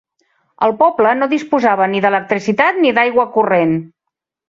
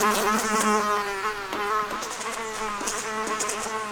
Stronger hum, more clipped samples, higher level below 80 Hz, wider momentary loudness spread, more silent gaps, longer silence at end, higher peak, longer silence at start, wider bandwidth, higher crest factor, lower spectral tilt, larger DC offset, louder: neither; neither; second, -60 dBFS vs -52 dBFS; second, 5 LU vs 8 LU; neither; first, 0.6 s vs 0 s; first, -2 dBFS vs -8 dBFS; first, 0.6 s vs 0 s; second, 7.6 kHz vs 19.5 kHz; about the same, 14 dB vs 18 dB; first, -6.5 dB/octave vs -2 dB/octave; neither; first, -14 LUFS vs -26 LUFS